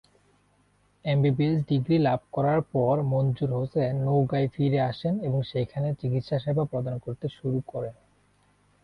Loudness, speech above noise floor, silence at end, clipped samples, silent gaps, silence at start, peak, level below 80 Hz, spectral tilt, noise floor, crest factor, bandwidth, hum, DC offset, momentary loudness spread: -27 LUFS; 40 dB; 0.9 s; under 0.1%; none; 1.05 s; -12 dBFS; -58 dBFS; -10 dB/octave; -65 dBFS; 14 dB; 5.2 kHz; 50 Hz at -50 dBFS; under 0.1%; 9 LU